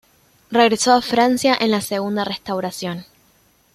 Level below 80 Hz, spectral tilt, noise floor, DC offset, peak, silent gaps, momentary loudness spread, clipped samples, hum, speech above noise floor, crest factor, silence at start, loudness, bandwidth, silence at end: -58 dBFS; -3.5 dB/octave; -57 dBFS; under 0.1%; -2 dBFS; none; 11 LU; under 0.1%; none; 39 dB; 18 dB; 0.5 s; -18 LUFS; 15.5 kHz; 0.7 s